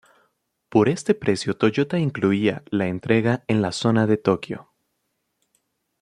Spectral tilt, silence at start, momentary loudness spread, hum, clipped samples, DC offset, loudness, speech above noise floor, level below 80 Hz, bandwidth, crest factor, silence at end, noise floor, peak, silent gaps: -6.5 dB/octave; 0.7 s; 5 LU; none; under 0.1%; under 0.1%; -22 LUFS; 54 dB; -60 dBFS; 11 kHz; 20 dB; 1.4 s; -75 dBFS; -4 dBFS; none